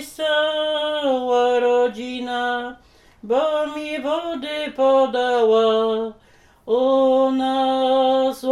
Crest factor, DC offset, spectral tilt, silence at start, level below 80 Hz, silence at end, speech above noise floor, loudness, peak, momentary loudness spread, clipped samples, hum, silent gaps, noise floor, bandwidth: 12 dB; under 0.1%; -3.5 dB/octave; 0 s; -58 dBFS; 0 s; 36 dB; -20 LUFS; -8 dBFS; 9 LU; under 0.1%; none; none; -53 dBFS; 13 kHz